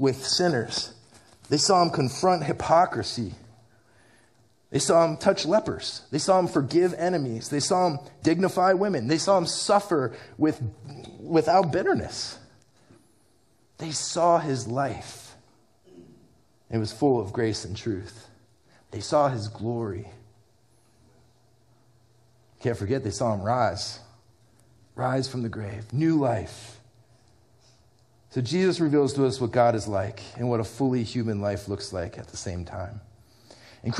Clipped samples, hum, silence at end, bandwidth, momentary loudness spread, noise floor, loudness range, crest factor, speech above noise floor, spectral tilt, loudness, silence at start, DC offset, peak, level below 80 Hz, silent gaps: under 0.1%; none; 0 s; 13.5 kHz; 14 LU; -64 dBFS; 7 LU; 22 dB; 39 dB; -5 dB/octave; -25 LUFS; 0 s; under 0.1%; -6 dBFS; -58 dBFS; none